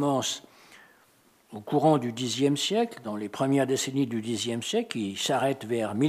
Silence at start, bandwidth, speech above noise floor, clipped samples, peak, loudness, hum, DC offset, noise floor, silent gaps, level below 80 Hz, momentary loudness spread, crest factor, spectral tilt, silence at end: 0 s; 15.5 kHz; 35 dB; under 0.1%; -10 dBFS; -27 LUFS; none; under 0.1%; -62 dBFS; none; -78 dBFS; 8 LU; 18 dB; -4.5 dB/octave; 0 s